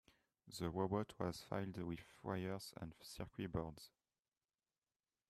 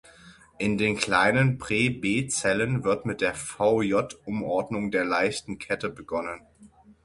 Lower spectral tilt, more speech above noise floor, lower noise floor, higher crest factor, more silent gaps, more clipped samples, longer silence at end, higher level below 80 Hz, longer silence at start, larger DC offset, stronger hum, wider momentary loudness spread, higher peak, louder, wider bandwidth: about the same, -6 dB/octave vs -5 dB/octave; first, over 44 dB vs 28 dB; first, under -90 dBFS vs -54 dBFS; about the same, 20 dB vs 20 dB; neither; neither; first, 1.4 s vs 0.15 s; second, -68 dBFS vs -56 dBFS; first, 0.45 s vs 0.25 s; neither; neither; about the same, 11 LU vs 10 LU; second, -26 dBFS vs -6 dBFS; second, -47 LUFS vs -26 LUFS; first, 14.5 kHz vs 11.5 kHz